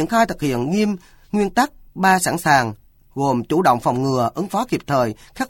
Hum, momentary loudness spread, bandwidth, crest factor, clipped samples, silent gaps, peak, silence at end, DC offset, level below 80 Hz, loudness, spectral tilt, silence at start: none; 7 LU; 17.5 kHz; 18 dB; under 0.1%; none; -2 dBFS; 0 s; under 0.1%; -46 dBFS; -19 LUFS; -5 dB/octave; 0 s